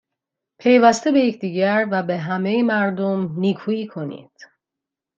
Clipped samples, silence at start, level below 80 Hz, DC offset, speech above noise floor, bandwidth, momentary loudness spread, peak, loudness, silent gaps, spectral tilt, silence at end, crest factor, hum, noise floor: under 0.1%; 0.65 s; -68 dBFS; under 0.1%; 66 dB; 8 kHz; 12 LU; -2 dBFS; -19 LUFS; none; -6 dB/octave; 0.95 s; 18 dB; none; -85 dBFS